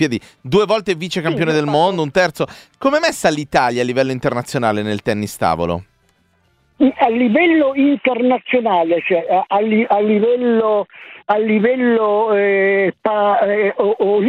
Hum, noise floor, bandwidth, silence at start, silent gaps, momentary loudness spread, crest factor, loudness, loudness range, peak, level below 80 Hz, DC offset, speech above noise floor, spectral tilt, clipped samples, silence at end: none; -59 dBFS; 15.5 kHz; 0 s; none; 6 LU; 16 dB; -16 LUFS; 3 LU; 0 dBFS; -52 dBFS; under 0.1%; 44 dB; -5.5 dB/octave; under 0.1%; 0 s